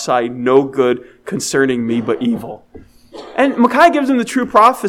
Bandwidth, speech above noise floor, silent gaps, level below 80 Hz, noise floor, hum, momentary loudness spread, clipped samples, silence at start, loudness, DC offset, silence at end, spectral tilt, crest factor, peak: 16 kHz; 20 dB; none; -52 dBFS; -35 dBFS; none; 13 LU; 0.2%; 0 s; -15 LUFS; under 0.1%; 0 s; -4.5 dB/octave; 14 dB; 0 dBFS